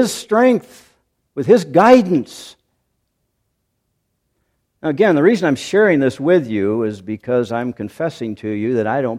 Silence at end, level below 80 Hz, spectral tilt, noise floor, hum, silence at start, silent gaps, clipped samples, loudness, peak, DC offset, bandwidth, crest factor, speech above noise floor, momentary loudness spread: 0 s; -60 dBFS; -6 dB/octave; -70 dBFS; none; 0 s; none; under 0.1%; -16 LUFS; 0 dBFS; under 0.1%; 15 kHz; 18 dB; 55 dB; 14 LU